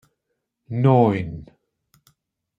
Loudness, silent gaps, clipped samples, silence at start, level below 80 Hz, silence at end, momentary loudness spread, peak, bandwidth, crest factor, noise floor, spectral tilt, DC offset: -19 LUFS; none; under 0.1%; 0.7 s; -54 dBFS; 1.15 s; 18 LU; -4 dBFS; 4.8 kHz; 20 dB; -78 dBFS; -10 dB/octave; under 0.1%